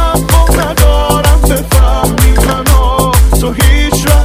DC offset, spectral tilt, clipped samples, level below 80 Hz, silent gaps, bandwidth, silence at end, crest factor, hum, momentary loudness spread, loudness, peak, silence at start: under 0.1%; -5 dB/octave; 3%; -10 dBFS; none; 16.5 kHz; 0 s; 8 dB; none; 2 LU; -9 LUFS; 0 dBFS; 0 s